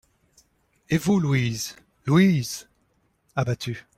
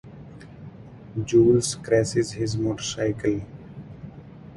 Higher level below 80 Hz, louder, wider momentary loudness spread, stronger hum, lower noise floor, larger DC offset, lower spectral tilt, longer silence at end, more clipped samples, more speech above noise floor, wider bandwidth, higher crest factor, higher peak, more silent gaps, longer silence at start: second, -56 dBFS vs -50 dBFS; about the same, -24 LUFS vs -23 LUFS; second, 14 LU vs 24 LU; neither; first, -68 dBFS vs -43 dBFS; neither; about the same, -6 dB/octave vs -5.5 dB/octave; first, 0.15 s vs 0 s; neither; first, 45 dB vs 21 dB; first, 16 kHz vs 11.5 kHz; about the same, 18 dB vs 18 dB; about the same, -6 dBFS vs -8 dBFS; neither; first, 0.9 s vs 0.05 s